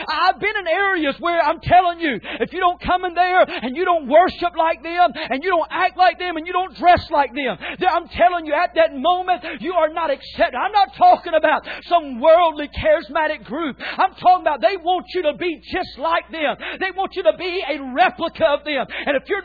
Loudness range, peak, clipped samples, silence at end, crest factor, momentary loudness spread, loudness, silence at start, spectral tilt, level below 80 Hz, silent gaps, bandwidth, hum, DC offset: 3 LU; -4 dBFS; under 0.1%; 0 s; 14 dB; 9 LU; -19 LUFS; 0 s; -6.5 dB/octave; -46 dBFS; none; 4.9 kHz; none; under 0.1%